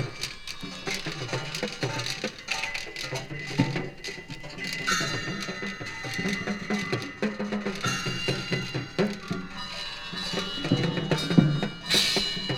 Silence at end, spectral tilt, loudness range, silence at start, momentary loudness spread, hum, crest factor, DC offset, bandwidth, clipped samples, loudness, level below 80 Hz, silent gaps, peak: 0 s; -4 dB/octave; 5 LU; 0 s; 11 LU; none; 26 dB; under 0.1%; 18 kHz; under 0.1%; -29 LUFS; -50 dBFS; none; -4 dBFS